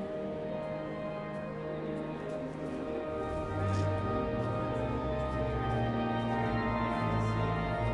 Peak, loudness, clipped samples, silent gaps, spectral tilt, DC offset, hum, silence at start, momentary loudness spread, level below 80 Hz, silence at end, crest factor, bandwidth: -20 dBFS; -34 LUFS; under 0.1%; none; -8 dB/octave; under 0.1%; none; 0 s; 7 LU; -46 dBFS; 0 s; 14 dB; 11 kHz